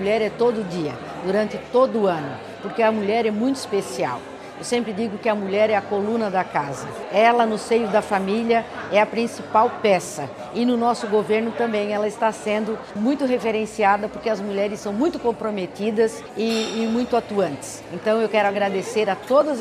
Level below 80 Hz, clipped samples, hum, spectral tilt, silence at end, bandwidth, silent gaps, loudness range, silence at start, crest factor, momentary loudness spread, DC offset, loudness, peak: -58 dBFS; under 0.1%; none; -5 dB/octave; 0 s; 14.5 kHz; none; 3 LU; 0 s; 18 dB; 8 LU; under 0.1%; -22 LUFS; -4 dBFS